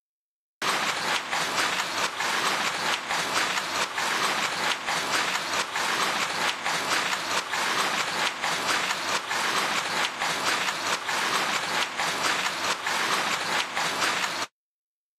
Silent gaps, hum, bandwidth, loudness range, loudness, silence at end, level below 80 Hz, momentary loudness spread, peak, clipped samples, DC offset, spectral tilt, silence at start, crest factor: none; none; 14 kHz; 0 LU; -25 LUFS; 0.7 s; -68 dBFS; 2 LU; -10 dBFS; under 0.1%; under 0.1%; -0.5 dB/octave; 0.6 s; 18 dB